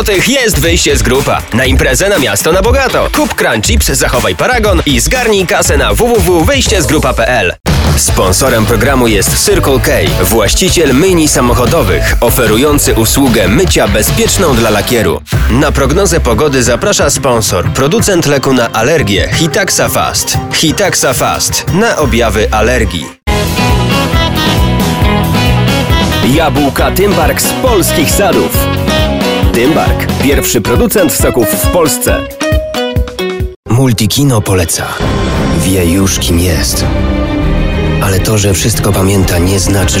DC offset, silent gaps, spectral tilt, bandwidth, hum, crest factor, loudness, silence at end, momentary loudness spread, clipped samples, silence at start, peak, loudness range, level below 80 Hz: under 0.1%; 33.56-33.63 s; -4 dB/octave; over 20 kHz; none; 8 dB; -9 LUFS; 0 s; 4 LU; under 0.1%; 0 s; 0 dBFS; 3 LU; -18 dBFS